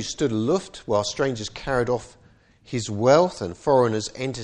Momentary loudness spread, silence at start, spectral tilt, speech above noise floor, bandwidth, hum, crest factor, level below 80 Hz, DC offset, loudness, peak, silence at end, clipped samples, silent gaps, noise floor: 11 LU; 0 s; -5 dB/octave; 32 dB; 10.5 kHz; none; 20 dB; -50 dBFS; under 0.1%; -23 LUFS; -4 dBFS; 0 s; under 0.1%; none; -55 dBFS